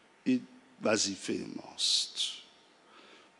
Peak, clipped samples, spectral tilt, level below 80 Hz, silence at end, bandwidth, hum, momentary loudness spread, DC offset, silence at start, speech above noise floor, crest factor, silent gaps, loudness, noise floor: -14 dBFS; under 0.1%; -2 dB/octave; -84 dBFS; 0.25 s; 11 kHz; none; 10 LU; under 0.1%; 0.25 s; 28 dB; 22 dB; none; -31 LUFS; -61 dBFS